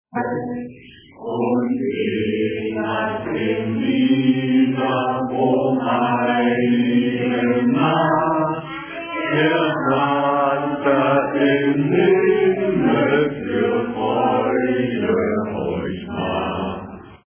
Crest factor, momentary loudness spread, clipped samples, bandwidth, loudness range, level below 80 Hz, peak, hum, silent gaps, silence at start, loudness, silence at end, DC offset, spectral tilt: 14 dB; 8 LU; under 0.1%; 3.5 kHz; 4 LU; -50 dBFS; -6 dBFS; none; none; 0.15 s; -19 LUFS; 0.1 s; under 0.1%; -10.5 dB/octave